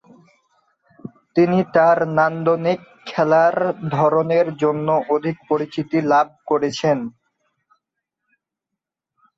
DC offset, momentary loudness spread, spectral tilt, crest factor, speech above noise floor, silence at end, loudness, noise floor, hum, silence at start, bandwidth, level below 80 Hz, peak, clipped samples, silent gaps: under 0.1%; 9 LU; -7 dB/octave; 18 dB; 66 dB; 2.3 s; -19 LUFS; -84 dBFS; none; 1.05 s; 7.8 kHz; -64 dBFS; -2 dBFS; under 0.1%; none